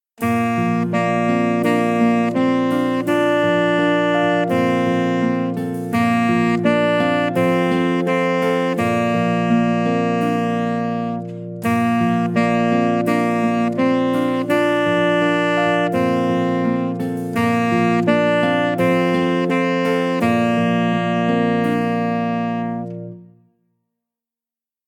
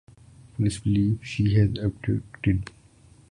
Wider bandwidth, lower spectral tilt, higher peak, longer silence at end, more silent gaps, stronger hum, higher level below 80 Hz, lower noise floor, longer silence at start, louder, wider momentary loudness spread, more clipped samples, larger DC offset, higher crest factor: first, 16.5 kHz vs 11 kHz; about the same, -7 dB/octave vs -7 dB/octave; first, -2 dBFS vs -8 dBFS; first, 1.65 s vs 0.65 s; neither; neither; second, -64 dBFS vs -42 dBFS; first, -90 dBFS vs -54 dBFS; second, 0.2 s vs 0.6 s; first, -18 LUFS vs -25 LUFS; about the same, 5 LU vs 7 LU; neither; neither; about the same, 16 dB vs 16 dB